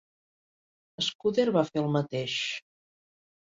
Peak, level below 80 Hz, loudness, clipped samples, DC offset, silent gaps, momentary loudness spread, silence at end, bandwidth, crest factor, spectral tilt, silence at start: -12 dBFS; -70 dBFS; -28 LUFS; under 0.1%; under 0.1%; 1.15-1.19 s; 7 LU; 0.8 s; 7.8 kHz; 20 dB; -5 dB/octave; 1 s